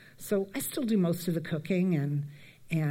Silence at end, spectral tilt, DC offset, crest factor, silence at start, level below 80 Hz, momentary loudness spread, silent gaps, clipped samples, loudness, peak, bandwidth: 0 s; -6.5 dB/octave; under 0.1%; 14 dB; 0.2 s; -66 dBFS; 6 LU; none; under 0.1%; -31 LUFS; -16 dBFS; 16.5 kHz